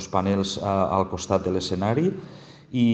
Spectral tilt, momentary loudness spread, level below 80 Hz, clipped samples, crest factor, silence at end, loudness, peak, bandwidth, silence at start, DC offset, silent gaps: -6 dB/octave; 7 LU; -52 dBFS; under 0.1%; 18 dB; 0 s; -24 LUFS; -6 dBFS; 8.6 kHz; 0 s; under 0.1%; none